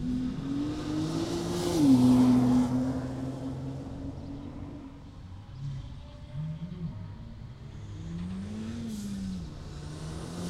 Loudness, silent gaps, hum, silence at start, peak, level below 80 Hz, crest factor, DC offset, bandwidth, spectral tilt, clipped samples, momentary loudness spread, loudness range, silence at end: -30 LUFS; none; none; 0 s; -12 dBFS; -48 dBFS; 18 dB; under 0.1%; 13.5 kHz; -7 dB/octave; under 0.1%; 22 LU; 15 LU; 0 s